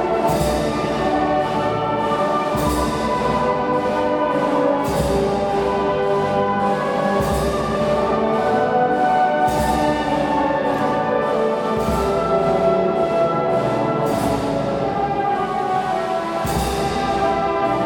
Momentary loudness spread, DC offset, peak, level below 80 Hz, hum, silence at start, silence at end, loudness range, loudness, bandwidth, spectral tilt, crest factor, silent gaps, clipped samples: 3 LU; under 0.1%; -6 dBFS; -36 dBFS; none; 0 s; 0 s; 2 LU; -19 LUFS; 19.5 kHz; -6 dB/octave; 14 dB; none; under 0.1%